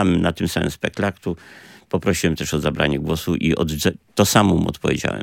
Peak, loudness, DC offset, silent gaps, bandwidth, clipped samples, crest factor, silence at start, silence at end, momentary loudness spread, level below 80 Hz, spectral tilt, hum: 0 dBFS; -20 LUFS; under 0.1%; none; 17 kHz; under 0.1%; 20 dB; 0 s; 0 s; 8 LU; -42 dBFS; -5 dB/octave; none